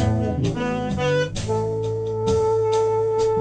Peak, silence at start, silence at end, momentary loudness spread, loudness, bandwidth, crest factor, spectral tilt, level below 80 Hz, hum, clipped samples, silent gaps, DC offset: -8 dBFS; 0 s; 0 s; 5 LU; -22 LUFS; 9.8 kHz; 14 dB; -6.5 dB/octave; -40 dBFS; none; under 0.1%; none; under 0.1%